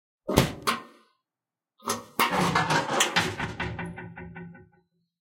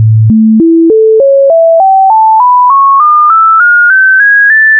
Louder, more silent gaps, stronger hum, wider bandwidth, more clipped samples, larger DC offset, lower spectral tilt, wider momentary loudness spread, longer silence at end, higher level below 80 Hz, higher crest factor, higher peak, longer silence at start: second, -26 LUFS vs -4 LUFS; neither; neither; first, 16.5 kHz vs 2.2 kHz; neither; neither; second, -3.5 dB/octave vs -14.5 dB/octave; first, 19 LU vs 2 LU; first, 0.6 s vs 0 s; about the same, -48 dBFS vs -46 dBFS; first, 28 dB vs 4 dB; about the same, 0 dBFS vs 0 dBFS; first, 0.25 s vs 0 s